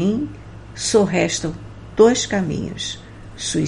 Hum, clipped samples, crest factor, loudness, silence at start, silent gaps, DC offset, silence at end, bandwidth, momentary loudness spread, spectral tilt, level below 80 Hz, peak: none; under 0.1%; 20 dB; -20 LUFS; 0 s; none; under 0.1%; 0 s; 11.5 kHz; 21 LU; -4.5 dB/octave; -44 dBFS; 0 dBFS